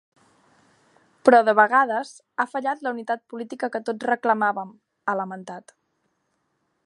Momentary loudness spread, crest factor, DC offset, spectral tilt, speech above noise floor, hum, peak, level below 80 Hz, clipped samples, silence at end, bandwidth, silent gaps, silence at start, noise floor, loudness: 18 LU; 24 dB; under 0.1%; -5 dB/octave; 50 dB; none; 0 dBFS; -78 dBFS; under 0.1%; 1.25 s; 11 kHz; none; 1.25 s; -73 dBFS; -22 LUFS